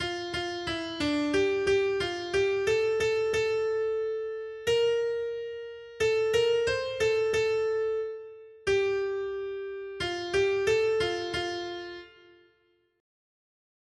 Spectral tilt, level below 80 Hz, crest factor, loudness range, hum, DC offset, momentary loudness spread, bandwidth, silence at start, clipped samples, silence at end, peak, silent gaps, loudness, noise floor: -4 dB/octave; -58 dBFS; 14 dB; 3 LU; none; under 0.1%; 11 LU; 12.5 kHz; 0 s; under 0.1%; 1.9 s; -14 dBFS; none; -28 LUFS; -69 dBFS